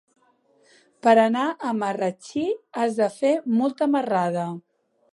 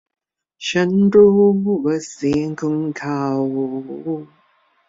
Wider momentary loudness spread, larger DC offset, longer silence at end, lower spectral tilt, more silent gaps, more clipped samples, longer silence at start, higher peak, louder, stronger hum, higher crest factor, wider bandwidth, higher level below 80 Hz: second, 10 LU vs 15 LU; neither; about the same, 0.55 s vs 0.65 s; about the same, -6 dB/octave vs -6.5 dB/octave; neither; neither; first, 1.05 s vs 0.6 s; about the same, -4 dBFS vs -2 dBFS; second, -23 LUFS vs -18 LUFS; neither; about the same, 20 dB vs 16 dB; first, 11.5 kHz vs 7.8 kHz; second, -76 dBFS vs -56 dBFS